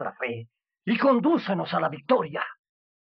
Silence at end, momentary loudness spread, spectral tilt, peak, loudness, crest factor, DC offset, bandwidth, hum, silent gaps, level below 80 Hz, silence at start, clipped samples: 0.55 s; 13 LU; -9 dB/octave; -8 dBFS; -25 LUFS; 18 dB; under 0.1%; 5.8 kHz; none; none; -76 dBFS; 0 s; under 0.1%